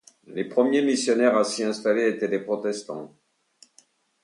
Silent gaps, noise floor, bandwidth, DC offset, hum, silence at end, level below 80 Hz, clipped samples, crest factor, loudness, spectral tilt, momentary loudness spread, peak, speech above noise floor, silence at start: none; -61 dBFS; 11.5 kHz; under 0.1%; none; 1.15 s; -76 dBFS; under 0.1%; 18 dB; -24 LUFS; -4 dB/octave; 13 LU; -6 dBFS; 38 dB; 0.3 s